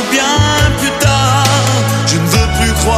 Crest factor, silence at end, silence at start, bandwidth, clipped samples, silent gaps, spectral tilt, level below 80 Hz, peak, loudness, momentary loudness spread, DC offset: 12 dB; 0 s; 0 s; 15.5 kHz; under 0.1%; none; -4 dB/octave; -22 dBFS; 0 dBFS; -11 LUFS; 2 LU; under 0.1%